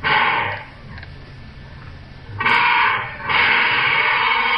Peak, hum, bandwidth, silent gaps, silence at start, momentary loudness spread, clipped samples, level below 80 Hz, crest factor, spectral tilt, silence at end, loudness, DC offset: -2 dBFS; none; 9 kHz; none; 0 s; 23 LU; under 0.1%; -46 dBFS; 16 dB; -5 dB/octave; 0 s; -16 LUFS; under 0.1%